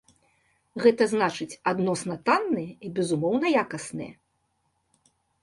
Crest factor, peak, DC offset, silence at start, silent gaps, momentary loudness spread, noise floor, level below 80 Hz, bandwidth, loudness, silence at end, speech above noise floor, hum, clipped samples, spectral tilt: 20 dB; -6 dBFS; under 0.1%; 0.75 s; none; 13 LU; -73 dBFS; -68 dBFS; 11.5 kHz; -26 LUFS; 1.3 s; 48 dB; none; under 0.1%; -5.5 dB/octave